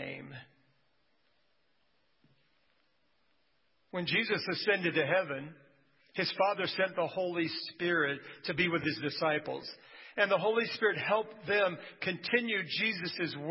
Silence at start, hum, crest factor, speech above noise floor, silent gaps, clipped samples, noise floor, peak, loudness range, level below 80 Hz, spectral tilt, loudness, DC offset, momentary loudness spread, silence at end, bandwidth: 0 s; none; 22 dB; 44 dB; none; under 0.1%; -76 dBFS; -12 dBFS; 4 LU; -76 dBFS; -8 dB/octave; -32 LUFS; under 0.1%; 13 LU; 0 s; 5.8 kHz